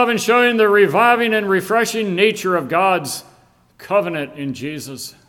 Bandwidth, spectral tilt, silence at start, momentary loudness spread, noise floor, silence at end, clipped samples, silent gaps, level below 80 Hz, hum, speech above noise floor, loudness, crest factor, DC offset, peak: 17.5 kHz; -4 dB/octave; 0 s; 14 LU; -52 dBFS; 0.2 s; under 0.1%; none; -62 dBFS; none; 35 dB; -16 LUFS; 16 dB; under 0.1%; 0 dBFS